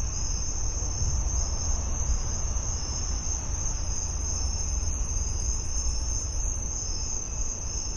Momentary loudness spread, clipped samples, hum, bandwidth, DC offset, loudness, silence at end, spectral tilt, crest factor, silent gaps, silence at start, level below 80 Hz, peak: 2 LU; under 0.1%; none; 11 kHz; under 0.1%; -30 LUFS; 0 s; -3 dB/octave; 12 dB; none; 0 s; -30 dBFS; -16 dBFS